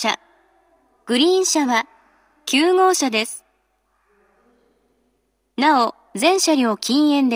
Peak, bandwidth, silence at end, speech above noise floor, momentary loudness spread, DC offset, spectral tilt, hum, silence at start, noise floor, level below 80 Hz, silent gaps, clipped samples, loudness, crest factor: -2 dBFS; over 20 kHz; 0 s; 51 dB; 13 LU; under 0.1%; -2 dB/octave; none; 0 s; -68 dBFS; -74 dBFS; none; under 0.1%; -18 LUFS; 18 dB